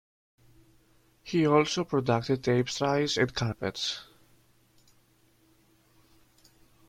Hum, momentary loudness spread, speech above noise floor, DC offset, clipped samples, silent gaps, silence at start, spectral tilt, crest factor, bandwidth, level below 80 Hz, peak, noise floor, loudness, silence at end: none; 9 LU; 38 dB; under 0.1%; under 0.1%; none; 1.25 s; -5 dB/octave; 22 dB; 15.5 kHz; -62 dBFS; -10 dBFS; -65 dBFS; -28 LUFS; 2.85 s